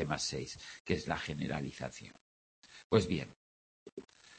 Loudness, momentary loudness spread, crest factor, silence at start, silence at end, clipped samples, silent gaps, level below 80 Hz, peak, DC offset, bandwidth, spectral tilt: -37 LUFS; 21 LU; 26 dB; 0 s; 0 s; under 0.1%; 0.80-0.85 s, 2.21-2.62 s, 2.84-2.90 s, 3.36-3.86 s, 3.92-3.97 s; -60 dBFS; -12 dBFS; under 0.1%; 8.4 kHz; -5 dB/octave